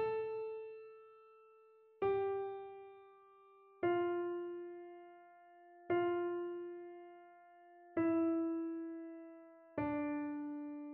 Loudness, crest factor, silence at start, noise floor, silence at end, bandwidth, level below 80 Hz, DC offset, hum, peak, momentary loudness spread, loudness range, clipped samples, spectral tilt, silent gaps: -40 LUFS; 16 dB; 0 s; -65 dBFS; 0 s; 4.3 kHz; -78 dBFS; under 0.1%; none; -24 dBFS; 24 LU; 4 LU; under 0.1%; -6 dB/octave; none